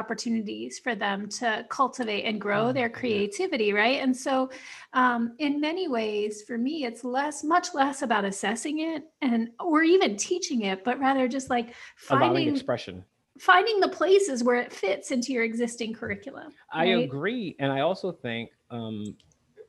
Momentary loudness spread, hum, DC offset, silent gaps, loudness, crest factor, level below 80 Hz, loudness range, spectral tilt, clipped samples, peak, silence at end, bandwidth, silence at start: 12 LU; none; under 0.1%; none; -26 LUFS; 22 dB; -72 dBFS; 4 LU; -4 dB/octave; under 0.1%; -6 dBFS; 0.05 s; 12.5 kHz; 0 s